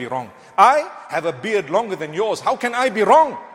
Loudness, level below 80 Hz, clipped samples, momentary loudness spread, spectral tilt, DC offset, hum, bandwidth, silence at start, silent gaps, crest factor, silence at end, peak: -18 LUFS; -62 dBFS; under 0.1%; 12 LU; -4 dB/octave; under 0.1%; none; 16.5 kHz; 0 s; none; 18 dB; 0 s; 0 dBFS